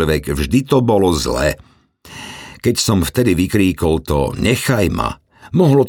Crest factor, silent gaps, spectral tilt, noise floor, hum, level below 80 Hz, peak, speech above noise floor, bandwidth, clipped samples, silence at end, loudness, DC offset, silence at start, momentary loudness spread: 14 dB; none; -5.5 dB/octave; -39 dBFS; none; -32 dBFS; -2 dBFS; 24 dB; 19.5 kHz; under 0.1%; 0 s; -16 LUFS; under 0.1%; 0 s; 17 LU